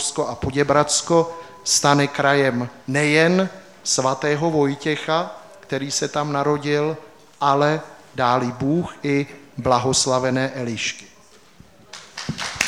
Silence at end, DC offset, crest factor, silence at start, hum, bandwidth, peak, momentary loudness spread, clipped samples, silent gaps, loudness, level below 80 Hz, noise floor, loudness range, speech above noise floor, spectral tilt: 0 s; 0.2%; 20 dB; 0 s; none; 15.5 kHz; 0 dBFS; 12 LU; under 0.1%; none; -20 LUFS; -52 dBFS; -50 dBFS; 4 LU; 30 dB; -4 dB/octave